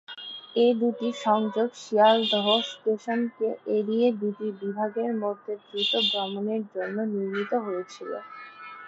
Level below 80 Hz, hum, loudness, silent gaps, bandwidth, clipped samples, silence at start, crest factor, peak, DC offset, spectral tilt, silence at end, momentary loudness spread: -80 dBFS; none; -26 LUFS; none; 8 kHz; under 0.1%; 0.1 s; 18 dB; -8 dBFS; under 0.1%; -5 dB/octave; 0 s; 14 LU